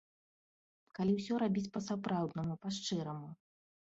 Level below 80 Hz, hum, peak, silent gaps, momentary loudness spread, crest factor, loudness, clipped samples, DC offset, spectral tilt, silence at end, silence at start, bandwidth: -72 dBFS; none; -22 dBFS; none; 11 LU; 16 dB; -37 LUFS; under 0.1%; under 0.1%; -6 dB/octave; 0.65 s; 0.95 s; 8 kHz